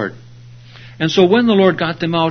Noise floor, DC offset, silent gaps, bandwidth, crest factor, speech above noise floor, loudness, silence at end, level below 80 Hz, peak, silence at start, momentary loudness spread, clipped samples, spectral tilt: -39 dBFS; under 0.1%; none; 6.6 kHz; 16 dB; 25 dB; -14 LUFS; 0 s; -54 dBFS; 0 dBFS; 0 s; 10 LU; under 0.1%; -6.5 dB/octave